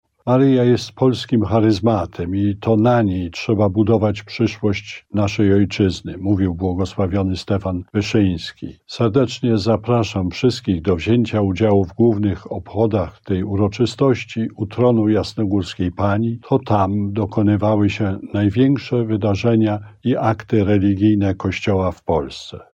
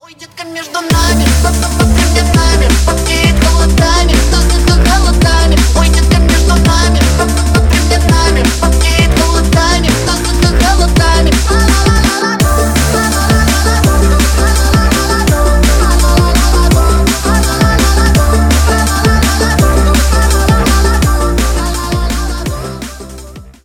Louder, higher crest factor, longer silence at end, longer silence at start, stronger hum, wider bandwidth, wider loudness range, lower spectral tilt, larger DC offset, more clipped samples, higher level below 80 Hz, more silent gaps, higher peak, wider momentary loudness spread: second, -18 LUFS vs -10 LUFS; first, 14 dB vs 8 dB; about the same, 0.15 s vs 0.15 s; about the same, 0.25 s vs 0.2 s; neither; second, 8.4 kHz vs 17.5 kHz; about the same, 2 LU vs 1 LU; first, -7.5 dB/octave vs -4.5 dB/octave; neither; neither; second, -46 dBFS vs -12 dBFS; neither; second, -4 dBFS vs 0 dBFS; first, 7 LU vs 4 LU